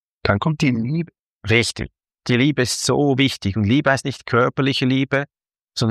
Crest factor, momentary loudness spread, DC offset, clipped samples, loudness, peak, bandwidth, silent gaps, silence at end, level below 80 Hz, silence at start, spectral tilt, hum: 18 dB; 14 LU; under 0.1%; under 0.1%; -19 LUFS; -2 dBFS; 14.5 kHz; 1.20-1.39 s, 5.61-5.68 s; 0 s; -48 dBFS; 0.25 s; -5 dB/octave; none